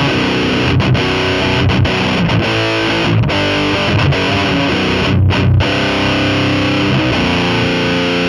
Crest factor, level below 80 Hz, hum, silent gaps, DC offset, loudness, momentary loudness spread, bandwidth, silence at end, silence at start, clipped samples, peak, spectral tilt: 12 dB; -30 dBFS; none; none; under 0.1%; -13 LUFS; 1 LU; 11.5 kHz; 0 s; 0 s; under 0.1%; -2 dBFS; -6 dB/octave